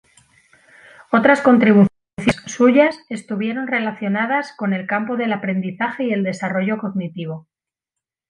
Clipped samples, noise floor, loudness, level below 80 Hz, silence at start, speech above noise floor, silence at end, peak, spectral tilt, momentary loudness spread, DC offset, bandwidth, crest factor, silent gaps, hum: under 0.1%; -85 dBFS; -18 LUFS; -54 dBFS; 1.1 s; 67 dB; 0.9 s; -2 dBFS; -6.5 dB/octave; 13 LU; under 0.1%; 11 kHz; 18 dB; 2.13-2.17 s; none